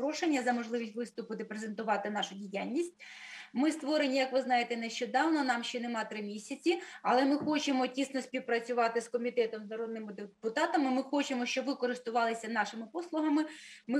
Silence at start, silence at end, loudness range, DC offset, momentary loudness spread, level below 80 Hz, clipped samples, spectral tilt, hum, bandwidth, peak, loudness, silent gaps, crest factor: 0 s; 0 s; 3 LU; under 0.1%; 11 LU; -86 dBFS; under 0.1%; -3.5 dB/octave; none; 12.5 kHz; -16 dBFS; -33 LUFS; none; 16 dB